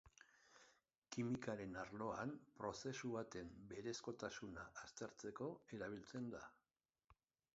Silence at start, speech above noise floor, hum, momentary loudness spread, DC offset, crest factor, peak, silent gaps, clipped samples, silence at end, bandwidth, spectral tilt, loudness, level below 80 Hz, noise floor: 0.05 s; over 40 dB; none; 15 LU; under 0.1%; 20 dB; -32 dBFS; 0.98-1.02 s; under 0.1%; 0.45 s; 7.6 kHz; -5 dB/octave; -51 LUFS; -76 dBFS; under -90 dBFS